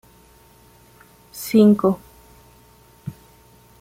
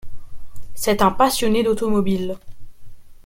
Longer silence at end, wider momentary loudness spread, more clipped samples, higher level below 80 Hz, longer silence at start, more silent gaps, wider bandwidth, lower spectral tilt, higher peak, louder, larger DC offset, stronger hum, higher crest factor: first, 0.7 s vs 0.1 s; first, 24 LU vs 10 LU; neither; second, -56 dBFS vs -40 dBFS; first, 1.35 s vs 0.05 s; neither; about the same, 16 kHz vs 16.5 kHz; first, -7 dB/octave vs -4.5 dB/octave; about the same, -4 dBFS vs -2 dBFS; about the same, -18 LUFS vs -19 LUFS; neither; first, 60 Hz at -55 dBFS vs none; about the same, 18 dB vs 18 dB